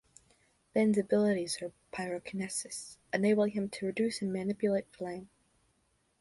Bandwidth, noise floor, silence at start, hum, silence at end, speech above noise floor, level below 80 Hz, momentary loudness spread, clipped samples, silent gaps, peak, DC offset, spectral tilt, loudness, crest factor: 11.5 kHz; -74 dBFS; 0.75 s; none; 0.95 s; 42 dB; -72 dBFS; 13 LU; under 0.1%; none; -14 dBFS; under 0.1%; -5 dB/octave; -33 LUFS; 18 dB